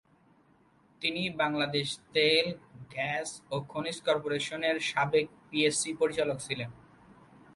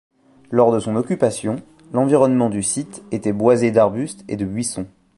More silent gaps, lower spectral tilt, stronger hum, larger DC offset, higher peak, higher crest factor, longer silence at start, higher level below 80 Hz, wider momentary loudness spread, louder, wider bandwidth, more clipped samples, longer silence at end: neither; second, -3.5 dB/octave vs -6 dB/octave; neither; neither; second, -12 dBFS vs -2 dBFS; about the same, 20 dB vs 18 dB; first, 1 s vs 0.5 s; second, -68 dBFS vs -54 dBFS; second, 9 LU vs 12 LU; second, -30 LUFS vs -19 LUFS; about the same, 11.5 kHz vs 11.5 kHz; neither; first, 0.8 s vs 0.3 s